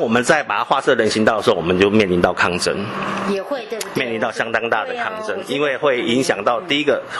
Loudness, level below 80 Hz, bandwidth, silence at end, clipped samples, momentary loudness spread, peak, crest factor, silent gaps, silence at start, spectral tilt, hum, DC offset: -18 LUFS; -52 dBFS; 12.5 kHz; 0 s; under 0.1%; 8 LU; 0 dBFS; 18 dB; none; 0 s; -4.5 dB/octave; none; under 0.1%